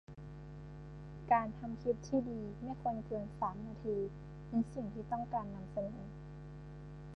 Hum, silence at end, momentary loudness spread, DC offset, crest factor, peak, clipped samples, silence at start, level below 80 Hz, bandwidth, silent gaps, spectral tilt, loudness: none; 0 s; 16 LU; under 0.1%; 22 dB; -18 dBFS; under 0.1%; 0.1 s; -56 dBFS; 8.6 kHz; none; -8.5 dB/octave; -39 LUFS